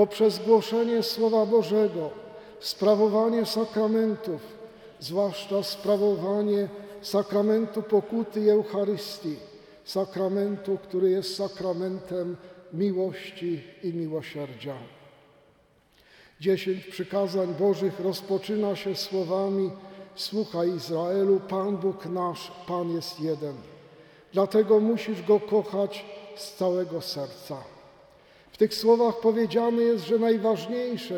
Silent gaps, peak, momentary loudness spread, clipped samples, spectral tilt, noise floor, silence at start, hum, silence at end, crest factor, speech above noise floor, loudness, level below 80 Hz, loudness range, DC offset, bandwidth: none; -8 dBFS; 14 LU; under 0.1%; -6 dB/octave; -62 dBFS; 0 s; none; 0 s; 18 dB; 36 dB; -26 LUFS; -70 dBFS; 7 LU; under 0.1%; 18 kHz